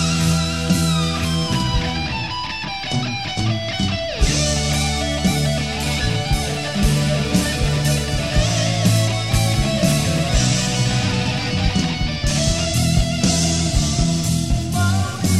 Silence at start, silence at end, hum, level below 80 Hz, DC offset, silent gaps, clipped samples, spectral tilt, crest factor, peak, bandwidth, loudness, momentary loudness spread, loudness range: 0 s; 0 s; none; -28 dBFS; 0.9%; none; under 0.1%; -4.5 dB/octave; 14 dB; -4 dBFS; 15 kHz; -19 LUFS; 4 LU; 3 LU